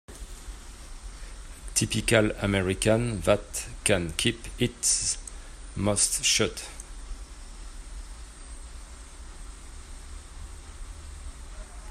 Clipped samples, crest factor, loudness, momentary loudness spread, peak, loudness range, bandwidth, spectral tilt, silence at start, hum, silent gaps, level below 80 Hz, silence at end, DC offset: under 0.1%; 24 dB; -25 LUFS; 22 LU; -6 dBFS; 19 LU; 15 kHz; -3 dB/octave; 0.1 s; none; none; -42 dBFS; 0 s; under 0.1%